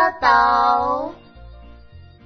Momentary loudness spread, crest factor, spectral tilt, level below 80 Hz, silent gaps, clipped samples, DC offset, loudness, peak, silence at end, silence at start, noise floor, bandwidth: 11 LU; 20 dB; -4.5 dB/octave; -44 dBFS; none; under 0.1%; under 0.1%; -17 LUFS; 0 dBFS; 0.25 s; 0 s; -43 dBFS; 6.4 kHz